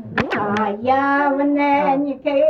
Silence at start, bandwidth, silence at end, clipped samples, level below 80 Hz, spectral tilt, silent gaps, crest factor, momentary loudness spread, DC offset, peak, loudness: 0 s; 6.8 kHz; 0 s; under 0.1%; -54 dBFS; -7 dB/octave; none; 14 dB; 4 LU; under 0.1%; -4 dBFS; -18 LUFS